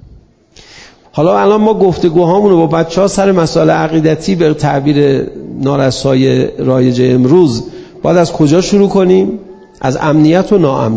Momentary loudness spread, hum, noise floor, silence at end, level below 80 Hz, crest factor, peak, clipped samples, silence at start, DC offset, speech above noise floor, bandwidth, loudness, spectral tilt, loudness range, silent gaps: 8 LU; none; -41 dBFS; 0 s; -40 dBFS; 10 dB; 0 dBFS; 0.6%; 0.75 s; under 0.1%; 32 dB; 8 kHz; -10 LUFS; -7 dB/octave; 1 LU; none